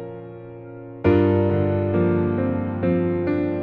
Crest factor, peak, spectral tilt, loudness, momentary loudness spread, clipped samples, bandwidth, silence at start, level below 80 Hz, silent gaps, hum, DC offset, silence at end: 16 dB; -4 dBFS; -11.5 dB/octave; -21 LUFS; 20 LU; under 0.1%; 4.6 kHz; 0 s; -48 dBFS; none; none; under 0.1%; 0 s